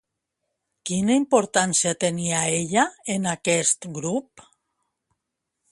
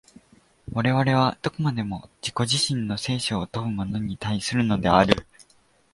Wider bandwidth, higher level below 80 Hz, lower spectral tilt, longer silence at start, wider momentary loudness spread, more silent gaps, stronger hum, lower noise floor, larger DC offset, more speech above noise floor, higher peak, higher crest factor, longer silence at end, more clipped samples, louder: about the same, 11.5 kHz vs 11.5 kHz; second, -64 dBFS vs -48 dBFS; second, -3.5 dB/octave vs -5 dB/octave; first, 0.85 s vs 0.7 s; about the same, 8 LU vs 10 LU; neither; neither; first, -81 dBFS vs -61 dBFS; neither; first, 59 dB vs 37 dB; about the same, -4 dBFS vs -2 dBFS; about the same, 20 dB vs 24 dB; first, 1.5 s vs 0.5 s; neither; about the same, -22 LUFS vs -24 LUFS